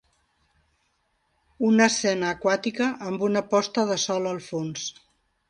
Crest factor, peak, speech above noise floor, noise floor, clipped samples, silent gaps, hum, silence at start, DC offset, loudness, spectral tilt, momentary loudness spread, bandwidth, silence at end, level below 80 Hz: 22 dB; -4 dBFS; 47 dB; -71 dBFS; under 0.1%; none; none; 1.6 s; under 0.1%; -24 LUFS; -4 dB/octave; 11 LU; 10.5 kHz; 0.6 s; -66 dBFS